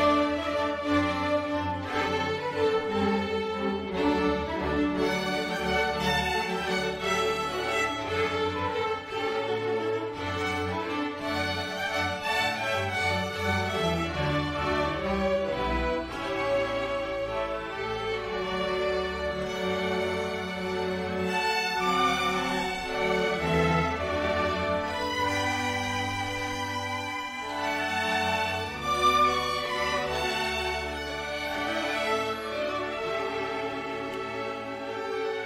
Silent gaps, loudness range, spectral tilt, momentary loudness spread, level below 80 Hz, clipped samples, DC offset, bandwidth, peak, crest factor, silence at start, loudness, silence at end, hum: none; 3 LU; -4.5 dB/octave; 6 LU; -48 dBFS; under 0.1%; under 0.1%; 16 kHz; -10 dBFS; 18 dB; 0 s; -28 LUFS; 0 s; none